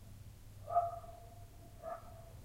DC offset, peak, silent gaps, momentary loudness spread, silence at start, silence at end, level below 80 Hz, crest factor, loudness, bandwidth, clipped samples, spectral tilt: under 0.1%; -22 dBFS; none; 20 LU; 0 s; 0 s; -58 dBFS; 22 dB; -41 LUFS; 16 kHz; under 0.1%; -6 dB/octave